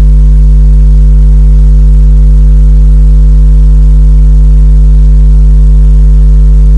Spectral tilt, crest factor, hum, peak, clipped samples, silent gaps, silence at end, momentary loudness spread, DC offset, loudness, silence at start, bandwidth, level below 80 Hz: -9.5 dB/octave; 2 dB; none; 0 dBFS; 0.3%; none; 0 s; 0 LU; 0.2%; -6 LUFS; 0 s; 1.4 kHz; -2 dBFS